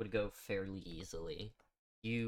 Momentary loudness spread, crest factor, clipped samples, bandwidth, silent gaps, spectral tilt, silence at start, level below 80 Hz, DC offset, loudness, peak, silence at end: 8 LU; 20 dB; under 0.1%; 17.5 kHz; 1.79-2.02 s; -5.5 dB/octave; 0 s; -58 dBFS; under 0.1%; -44 LUFS; -24 dBFS; 0 s